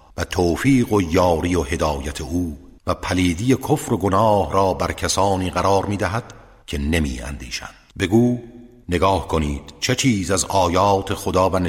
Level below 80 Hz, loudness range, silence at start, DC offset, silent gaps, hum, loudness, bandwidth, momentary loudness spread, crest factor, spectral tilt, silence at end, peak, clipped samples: -36 dBFS; 3 LU; 0.15 s; under 0.1%; none; none; -20 LUFS; 16.5 kHz; 10 LU; 16 dB; -5 dB/octave; 0 s; -4 dBFS; under 0.1%